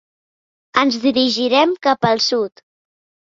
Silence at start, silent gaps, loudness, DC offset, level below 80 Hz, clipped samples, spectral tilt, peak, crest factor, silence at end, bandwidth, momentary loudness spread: 0.75 s; none; -16 LUFS; under 0.1%; -60 dBFS; under 0.1%; -4 dB/octave; -2 dBFS; 16 dB; 0.75 s; 7.6 kHz; 6 LU